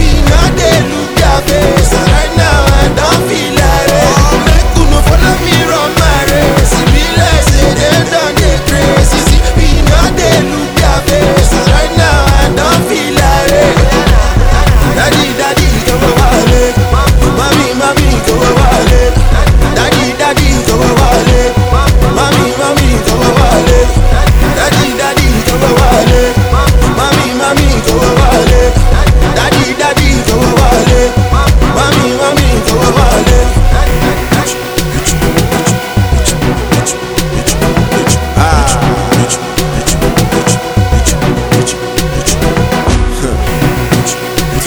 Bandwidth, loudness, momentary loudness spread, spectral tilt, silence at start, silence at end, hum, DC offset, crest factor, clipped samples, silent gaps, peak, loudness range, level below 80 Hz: over 20 kHz; -9 LUFS; 4 LU; -4.5 dB/octave; 0 s; 0 s; none; under 0.1%; 8 dB; 2%; none; 0 dBFS; 3 LU; -12 dBFS